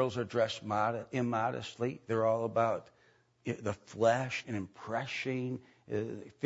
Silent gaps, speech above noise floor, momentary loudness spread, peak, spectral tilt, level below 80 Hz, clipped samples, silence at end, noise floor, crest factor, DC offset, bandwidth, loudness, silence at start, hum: none; 34 dB; 10 LU; -16 dBFS; -5 dB/octave; -72 dBFS; under 0.1%; 0.15 s; -68 dBFS; 20 dB; under 0.1%; 7.6 kHz; -34 LUFS; 0 s; none